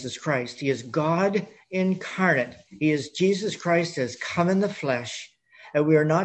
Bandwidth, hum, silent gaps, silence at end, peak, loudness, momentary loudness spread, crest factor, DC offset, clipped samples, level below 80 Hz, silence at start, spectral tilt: 8.8 kHz; none; none; 0 s; -6 dBFS; -25 LUFS; 7 LU; 18 dB; under 0.1%; under 0.1%; -66 dBFS; 0 s; -6 dB/octave